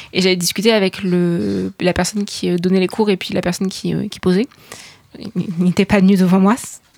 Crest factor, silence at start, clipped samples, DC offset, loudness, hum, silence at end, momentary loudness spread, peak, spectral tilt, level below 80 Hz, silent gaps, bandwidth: 16 dB; 0 s; under 0.1%; under 0.1%; -17 LUFS; none; 0.2 s; 11 LU; -2 dBFS; -5.5 dB/octave; -46 dBFS; none; 16 kHz